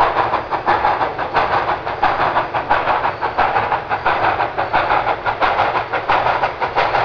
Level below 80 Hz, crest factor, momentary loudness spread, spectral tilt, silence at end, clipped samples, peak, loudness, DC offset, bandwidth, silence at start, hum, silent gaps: -42 dBFS; 16 dB; 3 LU; -5.5 dB/octave; 0 s; under 0.1%; -2 dBFS; -17 LUFS; 0.3%; 5.4 kHz; 0 s; none; none